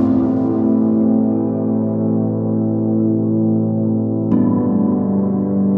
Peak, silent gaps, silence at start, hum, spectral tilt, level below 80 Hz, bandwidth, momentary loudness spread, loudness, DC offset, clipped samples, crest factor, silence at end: -4 dBFS; none; 0 s; none; -13.5 dB/octave; -52 dBFS; 2.1 kHz; 3 LU; -17 LUFS; under 0.1%; under 0.1%; 12 dB; 0 s